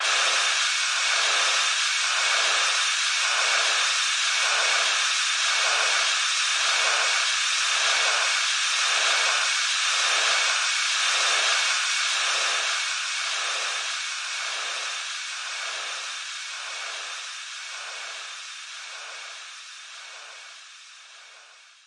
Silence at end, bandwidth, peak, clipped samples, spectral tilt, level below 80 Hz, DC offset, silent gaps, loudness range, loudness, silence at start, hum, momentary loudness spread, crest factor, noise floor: 0.4 s; 11.5 kHz; -8 dBFS; under 0.1%; 7 dB/octave; under -90 dBFS; under 0.1%; none; 14 LU; -22 LUFS; 0 s; none; 16 LU; 16 dB; -51 dBFS